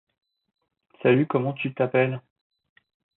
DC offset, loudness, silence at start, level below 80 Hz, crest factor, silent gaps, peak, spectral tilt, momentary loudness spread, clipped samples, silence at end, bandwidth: under 0.1%; -24 LUFS; 1.05 s; -72 dBFS; 20 dB; none; -8 dBFS; -11.5 dB/octave; 7 LU; under 0.1%; 1 s; 4.1 kHz